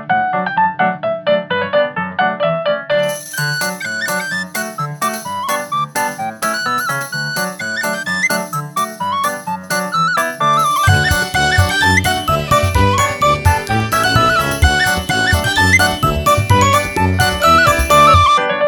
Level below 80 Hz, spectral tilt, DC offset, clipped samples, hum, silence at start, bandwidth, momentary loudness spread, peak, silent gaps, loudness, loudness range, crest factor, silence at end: -30 dBFS; -4 dB/octave; under 0.1%; under 0.1%; none; 0 s; 19.5 kHz; 9 LU; 0 dBFS; none; -14 LUFS; 7 LU; 14 dB; 0 s